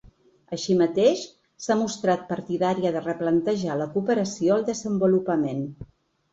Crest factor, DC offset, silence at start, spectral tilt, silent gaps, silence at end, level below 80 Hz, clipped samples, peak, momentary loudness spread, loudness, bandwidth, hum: 16 dB; under 0.1%; 0.05 s; -6 dB/octave; none; 0.45 s; -60 dBFS; under 0.1%; -8 dBFS; 10 LU; -24 LUFS; 8 kHz; none